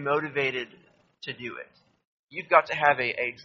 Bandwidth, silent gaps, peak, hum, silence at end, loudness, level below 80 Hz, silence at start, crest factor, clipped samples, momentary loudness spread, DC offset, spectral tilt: 7.4 kHz; 2.05-2.29 s; -4 dBFS; none; 0 s; -25 LUFS; -70 dBFS; 0 s; 24 dB; under 0.1%; 18 LU; under 0.1%; -1.5 dB/octave